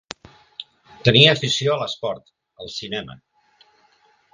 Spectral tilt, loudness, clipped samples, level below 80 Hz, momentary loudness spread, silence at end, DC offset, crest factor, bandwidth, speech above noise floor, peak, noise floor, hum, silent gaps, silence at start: -4.5 dB/octave; -18 LUFS; under 0.1%; -52 dBFS; 26 LU; 1.2 s; under 0.1%; 22 dB; 10 kHz; 40 dB; 0 dBFS; -59 dBFS; none; none; 0.6 s